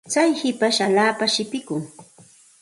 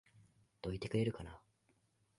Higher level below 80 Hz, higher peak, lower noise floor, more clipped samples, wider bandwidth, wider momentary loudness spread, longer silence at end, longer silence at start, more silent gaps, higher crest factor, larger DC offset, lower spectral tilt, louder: second, -70 dBFS vs -62 dBFS; first, -4 dBFS vs -24 dBFS; second, -51 dBFS vs -77 dBFS; neither; about the same, 11.5 kHz vs 11.5 kHz; second, 12 LU vs 16 LU; second, 0.6 s vs 0.8 s; about the same, 0.05 s vs 0.15 s; neither; about the same, 18 dB vs 20 dB; neither; second, -3 dB/octave vs -7 dB/octave; first, -20 LUFS vs -41 LUFS